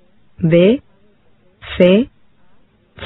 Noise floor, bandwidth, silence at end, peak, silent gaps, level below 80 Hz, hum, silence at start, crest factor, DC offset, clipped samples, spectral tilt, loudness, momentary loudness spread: -55 dBFS; 4.1 kHz; 0 s; 0 dBFS; none; -46 dBFS; none; 0.4 s; 16 dB; under 0.1%; under 0.1%; -10 dB/octave; -14 LUFS; 13 LU